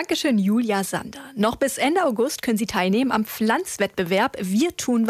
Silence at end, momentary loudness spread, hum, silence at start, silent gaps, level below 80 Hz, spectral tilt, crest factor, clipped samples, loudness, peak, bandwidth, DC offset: 0 s; 4 LU; none; 0 s; none; -56 dBFS; -4.5 dB/octave; 14 dB; under 0.1%; -22 LUFS; -8 dBFS; 15.5 kHz; under 0.1%